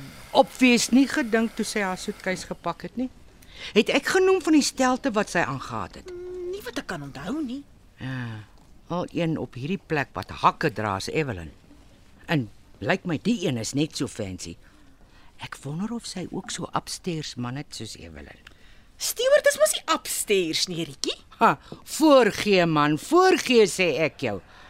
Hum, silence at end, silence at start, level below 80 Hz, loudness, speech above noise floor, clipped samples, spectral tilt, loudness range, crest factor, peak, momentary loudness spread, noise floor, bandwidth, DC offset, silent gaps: none; 0 s; 0 s; -54 dBFS; -24 LUFS; 27 dB; under 0.1%; -4 dB/octave; 12 LU; 22 dB; -2 dBFS; 16 LU; -51 dBFS; 16 kHz; under 0.1%; none